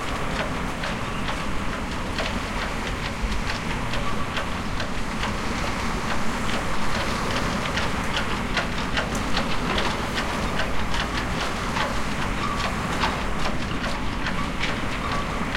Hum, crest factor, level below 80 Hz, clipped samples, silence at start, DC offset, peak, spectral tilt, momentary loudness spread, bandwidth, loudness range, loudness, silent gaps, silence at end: none; 16 dB; -34 dBFS; under 0.1%; 0 s; under 0.1%; -8 dBFS; -4.5 dB/octave; 3 LU; 16.5 kHz; 3 LU; -26 LUFS; none; 0 s